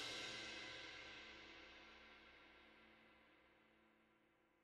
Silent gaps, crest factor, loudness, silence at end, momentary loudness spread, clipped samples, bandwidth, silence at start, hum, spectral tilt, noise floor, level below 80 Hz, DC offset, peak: none; 20 dB; -54 LUFS; 0 s; 18 LU; under 0.1%; 12 kHz; 0 s; none; -1.5 dB/octave; -78 dBFS; -80 dBFS; under 0.1%; -38 dBFS